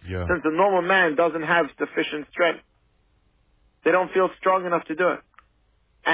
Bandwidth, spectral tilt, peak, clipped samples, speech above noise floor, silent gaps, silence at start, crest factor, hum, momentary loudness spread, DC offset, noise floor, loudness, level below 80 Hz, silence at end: 4 kHz; -9 dB/octave; -8 dBFS; under 0.1%; 42 dB; none; 0.05 s; 16 dB; none; 8 LU; under 0.1%; -64 dBFS; -22 LUFS; -48 dBFS; 0 s